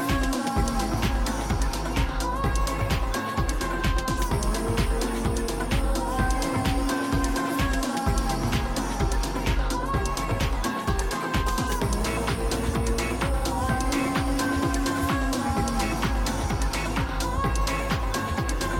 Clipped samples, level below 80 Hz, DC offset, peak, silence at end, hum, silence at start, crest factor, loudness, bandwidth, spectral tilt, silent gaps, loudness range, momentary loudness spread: under 0.1%; -28 dBFS; under 0.1%; -12 dBFS; 0 s; none; 0 s; 12 dB; -26 LUFS; 17 kHz; -5 dB/octave; none; 1 LU; 2 LU